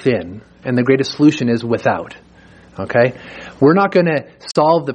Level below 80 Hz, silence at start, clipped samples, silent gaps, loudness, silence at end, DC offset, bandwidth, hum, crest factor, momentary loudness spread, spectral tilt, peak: -54 dBFS; 0 s; under 0.1%; none; -16 LUFS; 0 s; under 0.1%; 9.8 kHz; none; 14 dB; 17 LU; -7 dB/octave; -2 dBFS